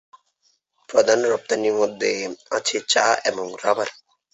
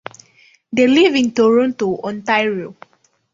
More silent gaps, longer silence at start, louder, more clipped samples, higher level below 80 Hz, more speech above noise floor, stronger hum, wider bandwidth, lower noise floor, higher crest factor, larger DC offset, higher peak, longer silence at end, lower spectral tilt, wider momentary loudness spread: neither; first, 0.9 s vs 0.7 s; second, -21 LUFS vs -16 LUFS; neither; second, -70 dBFS vs -60 dBFS; first, 46 dB vs 37 dB; neither; about the same, 8.2 kHz vs 7.6 kHz; first, -67 dBFS vs -52 dBFS; about the same, 18 dB vs 16 dB; neither; about the same, -4 dBFS vs -2 dBFS; second, 0.4 s vs 0.6 s; second, -1.5 dB/octave vs -5 dB/octave; second, 8 LU vs 14 LU